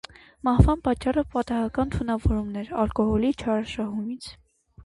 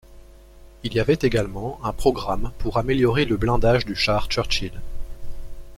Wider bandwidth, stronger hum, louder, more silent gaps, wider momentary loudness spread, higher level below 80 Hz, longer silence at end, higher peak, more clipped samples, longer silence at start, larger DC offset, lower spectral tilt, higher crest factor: second, 11.5 kHz vs 14 kHz; neither; second, -25 LUFS vs -22 LUFS; neither; second, 11 LU vs 21 LU; about the same, -34 dBFS vs -32 dBFS; about the same, 0 s vs 0 s; about the same, -2 dBFS vs -4 dBFS; neither; first, 0.45 s vs 0.1 s; neither; first, -8 dB/octave vs -6 dB/octave; about the same, 22 dB vs 18 dB